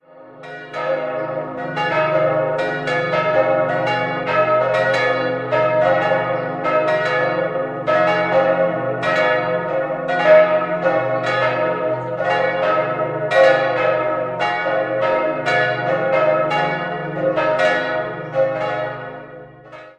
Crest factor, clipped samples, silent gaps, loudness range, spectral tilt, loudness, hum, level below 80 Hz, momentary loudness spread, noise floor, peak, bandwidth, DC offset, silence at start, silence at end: 18 dB; under 0.1%; none; 2 LU; -6 dB/octave; -18 LUFS; none; -56 dBFS; 7 LU; -39 dBFS; 0 dBFS; 8.8 kHz; under 0.1%; 0.15 s; 0.05 s